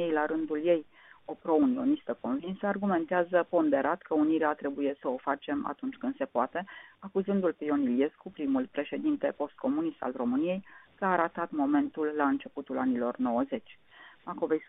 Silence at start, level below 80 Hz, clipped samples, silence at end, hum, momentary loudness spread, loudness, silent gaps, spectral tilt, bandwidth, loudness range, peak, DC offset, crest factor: 0 s; -70 dBFS; under 0.1%; 0.05 s; none; 9 LU; -30 LUFS; none; -2.5 dB/octave; 3.9 kHz; 3 LU; -12 dBFS; under 0.1%; 18 dB